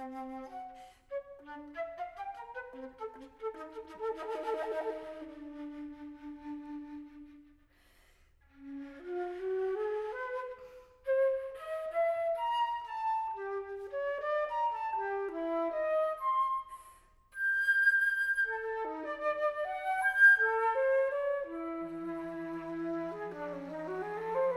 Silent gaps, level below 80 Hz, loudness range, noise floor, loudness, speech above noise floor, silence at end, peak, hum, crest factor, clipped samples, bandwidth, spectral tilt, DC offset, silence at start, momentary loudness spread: none; -68 dBFS; 15 LU; -65 dBFS; -33 LUFS; 26 dB; 0 s; -14 dBFS; none; 20 dB; under 0.1%; 15 kHz; -4.5 dB/octave; under 0.1%; 0 s; 17 LU